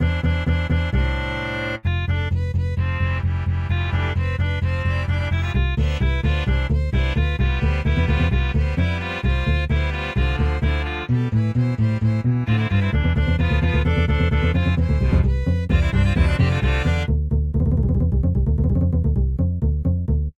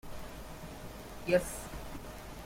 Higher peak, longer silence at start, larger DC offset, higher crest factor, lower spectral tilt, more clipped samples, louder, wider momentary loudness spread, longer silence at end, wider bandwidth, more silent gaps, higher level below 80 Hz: first, -6 dBFS vs -16 dBFS; about the same, 0 s vs 0.05 s; neither; second, 14 dB vs 22 dB; first, -8 dB/octave vs -4.5 dB/octave; neither; first, -21 LUFS vs -38 LUFS; second, 4 LU vs 16 LU; about the same, 0.05 s vs 0 s; second, 7.4 kHz vs 16.5 kHz; neither; first, -24 dBFS vs -50 dBFS